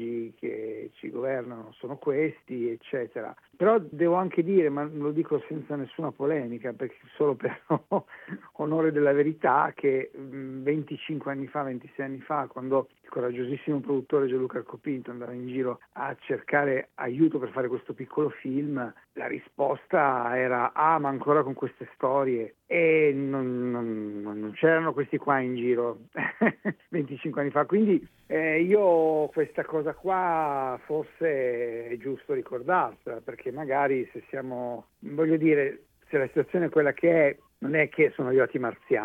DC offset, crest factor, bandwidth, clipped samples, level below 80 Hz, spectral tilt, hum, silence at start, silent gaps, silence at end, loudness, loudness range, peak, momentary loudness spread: under 0.1%; 18 dB; 4 kHz; under 0.1%; -72 dBFS; -9.5 dB/octave; none; 0 s; none; 0 s; -27 LUFS; 5 LU; -8 dBFS; 12 LU